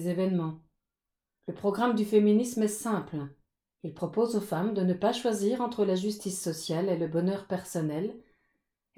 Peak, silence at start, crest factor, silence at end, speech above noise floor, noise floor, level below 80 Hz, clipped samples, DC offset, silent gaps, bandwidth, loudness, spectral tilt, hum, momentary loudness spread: -12 dBFS; 0 s; 18 dB; 0.75 s; 59 dB; -88 dBFS; -70 dBFS; under 0.1%; under 0.1%; none; 16.5 kHz; -29 LUFS; -6 dB/octave; none; 13 LU